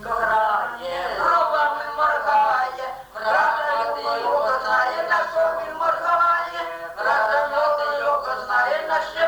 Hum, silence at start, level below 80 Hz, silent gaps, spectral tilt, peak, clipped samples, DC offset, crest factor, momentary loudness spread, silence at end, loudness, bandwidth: none; 0 s; -56 dBFS; none; -2.5 dB/octave; -8 dBFS; under 0.1%; under 0.1%; 14 dB; 8 LU; 0 s; -21 LUFS; over 20 kHz